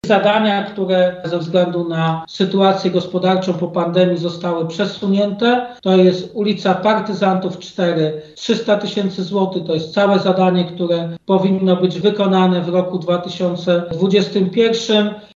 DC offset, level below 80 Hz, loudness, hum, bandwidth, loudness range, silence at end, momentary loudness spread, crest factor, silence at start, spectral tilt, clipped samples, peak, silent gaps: under 0.1%; -58 dBFS; -17 LUFS; none; 7.6 kHz; 2 LU; 0.1 s; 6 LU; 14 dB; 0.05 s; -6.5 dB/octave; under 0.1%; -2 dBFS; none